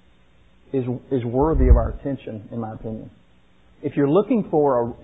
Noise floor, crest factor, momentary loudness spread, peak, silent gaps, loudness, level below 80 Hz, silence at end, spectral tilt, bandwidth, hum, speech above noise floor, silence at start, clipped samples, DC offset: -57 dBFS; 20 dB; 14 LU; -2 dBFS; none; -22 LUFS; -26 dBFS; 0.1 s; -12 dB/octave; 3.9 kHz; none; 36 dB; 0.75 s; under 0.1%; 0.2%